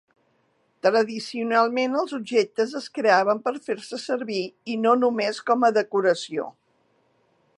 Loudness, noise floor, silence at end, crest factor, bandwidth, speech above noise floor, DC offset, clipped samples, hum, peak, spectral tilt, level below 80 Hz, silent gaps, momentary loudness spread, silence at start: -23 LUFS; -67 dBFS; 1.1 s; 20 dB; 11 kHz; 44 dB; under 0.1%; under 0.1%; none; -4 dBFS; -4.5 dB/octave; -82 dBFS; none; 10 LU; 0.85 s